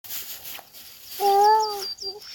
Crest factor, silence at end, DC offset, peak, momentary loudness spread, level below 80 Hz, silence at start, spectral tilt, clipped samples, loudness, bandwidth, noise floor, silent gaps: 16 dB; 0 s; under 0.1%; -10 dBFS; 20 LU; -68 dBFS; 0.05 s; -1 dB/octave; under 0.1%; -22 LUFS; 17.5 kHz; -45 dBFS; none